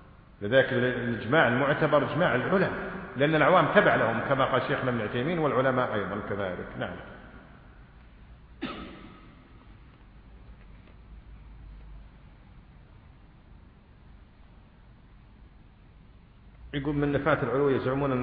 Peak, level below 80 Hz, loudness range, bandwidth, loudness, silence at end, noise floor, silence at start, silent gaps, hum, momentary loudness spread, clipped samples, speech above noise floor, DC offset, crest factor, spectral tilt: -4 dBFS; -52 dBFS; 22 LU; 5 kHz; -26 LUFS; 0 s; -53 dBFS; 0.4 s; none; none; 17 LU; under 0.1%; 28 dB; under 0.1%; 24 dB; -10 dB/octave